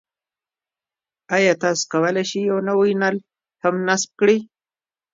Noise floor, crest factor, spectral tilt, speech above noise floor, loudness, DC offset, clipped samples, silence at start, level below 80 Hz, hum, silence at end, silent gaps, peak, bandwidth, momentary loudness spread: under -90 dBFS; 18 dB; -4 dB/octave; over 71 dB; -20 LUFS; under 0.1%; under 0.1%; 1.3 s; -72 dBFS; none; 0.7 s; none; -2 dBFS; 7.8 kHz; 5 LU